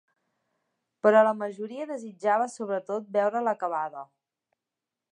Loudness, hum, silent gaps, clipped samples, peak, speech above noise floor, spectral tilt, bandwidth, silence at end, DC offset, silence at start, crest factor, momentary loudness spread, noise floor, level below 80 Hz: -27 LUFS; none; none; under 0.1%; -8 dBFS; 62 dB; -5.5 dB/octave; 10.5 kHz; 1.1 s; under 0.1%; 1.05 s; 22 dB; 15 LU; -88 dBFS; -88 dBFS